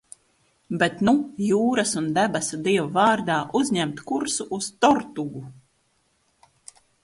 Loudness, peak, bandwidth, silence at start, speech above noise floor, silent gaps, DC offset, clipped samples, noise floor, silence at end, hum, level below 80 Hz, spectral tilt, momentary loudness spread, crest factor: -23 LUFS; -4 dBFS; 11.5 kHz; 0.7 s; 45 dB; none; under 0.1%; under 0.1%; -67 dBFS; 1.5 s; none; -62 dBFS; -4 dB/octave; 12 LU; 20 dB